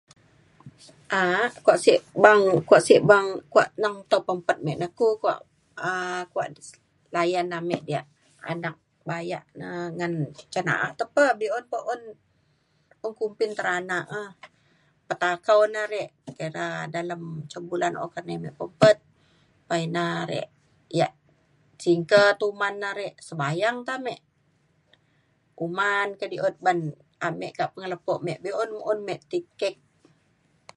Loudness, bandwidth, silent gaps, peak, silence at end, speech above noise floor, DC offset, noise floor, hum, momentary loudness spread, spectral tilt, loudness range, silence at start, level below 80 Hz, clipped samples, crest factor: -25 LUFS; 11.5 kHz; none; 0 dBFS; 1.05 s; 43 dB; under 0.1%; -67 dBFS; none; 16 LU; -5 dB/octave; 11 LU; 0.65 s; -70 dBFS; under 0.1%; 24 dB